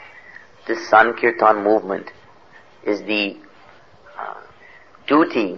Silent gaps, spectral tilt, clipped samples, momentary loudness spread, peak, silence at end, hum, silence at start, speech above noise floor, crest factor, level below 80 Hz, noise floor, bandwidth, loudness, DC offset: none; -5 dB/octave; under 0.1%; 22 LU; 0 dBFS; 0 s; none; 0 s; 31 dB; 20 dB; -64 dBFS; -49 dBFS; 6.8 kHz; -18 LUFS; 0.3%